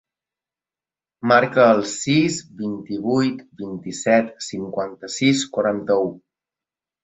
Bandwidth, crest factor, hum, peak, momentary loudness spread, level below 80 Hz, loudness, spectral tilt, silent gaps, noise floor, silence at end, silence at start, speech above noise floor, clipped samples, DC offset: 8.2 kHz; 20 dB; none; -2 dBFS; 13 LU; -62 dBFS; -20 LUFS; -4.5 dB/octave; none; under -90 dBFS; 0.85 s; 1.25 s; over 70 dB; under 0.1%; under 0.1%